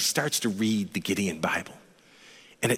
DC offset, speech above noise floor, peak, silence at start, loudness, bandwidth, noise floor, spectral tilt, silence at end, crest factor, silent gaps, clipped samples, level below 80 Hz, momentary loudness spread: under 0.1%; 26 dB; -10 dBFS; 0 s; -28 LUFS; 16.5 kHz; -54 dBFS; -3.5 dB/octave; 0 s; 18 dB; none; under 0.1%; -66 dBFS; 6 LU